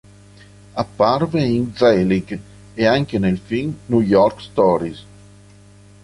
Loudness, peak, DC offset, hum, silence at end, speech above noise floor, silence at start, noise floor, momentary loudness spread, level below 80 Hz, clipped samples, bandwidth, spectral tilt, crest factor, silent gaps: -18 LUFS; -2 dBFS; under 0.1%; 50 Hz at -40 dBFS; 1 s; 28 dB; 0.75 s; -46 dBFS; 15 LU; -46 dBFS; under 0.1%; 11.5 kHz; -7.5 dB/octave; 16 dB; none